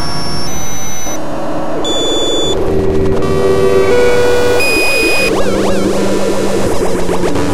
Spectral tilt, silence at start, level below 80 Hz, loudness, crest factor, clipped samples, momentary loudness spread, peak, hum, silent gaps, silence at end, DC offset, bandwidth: -4 dB/octave; 0 s; -28 dBFS; -13 LUFS; 12 dB; under 0.1%; 9 LU; 0 dBFS; none; none; 0 s; 20%; 16 kHz